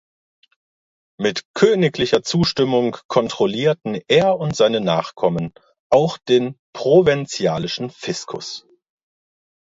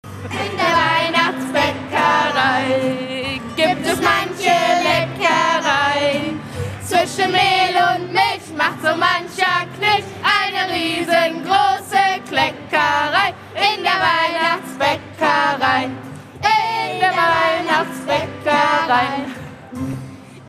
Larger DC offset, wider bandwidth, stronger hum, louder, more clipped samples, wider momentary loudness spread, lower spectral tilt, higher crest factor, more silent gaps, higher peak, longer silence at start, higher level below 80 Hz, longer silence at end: neither; second, 8 kHz vs 14.5 kHz; neither; about the same, -19 LUFS vs -17 LUFS; neither; about the same, 11 LU vs 9 LU; first, -5.5 dB/octave vs -3.5 dB/octave; about the same, 18 dB vs 16 dB; first, 1.45-1.54 s, 3.05-3.09 s, 5.79-5.90 s, 6.59-6.73 s vs none; about the same, 0 dBFS vs -2 dBFS; first, 1.2 s vs 0.05 s; about the same, -54 dBFS vs -54 dBFS; first, 1.05 s vs 0 s